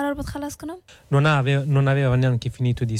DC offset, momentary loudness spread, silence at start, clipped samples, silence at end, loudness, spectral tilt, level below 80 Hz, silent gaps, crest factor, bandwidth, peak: under 0.1%; 15 LU; 0 s; under 0.1%; 0 s; -21 LUFS; -7 dB/octave; -44 dBFS; none; 12 dB; 13 kHz; -8 dBFS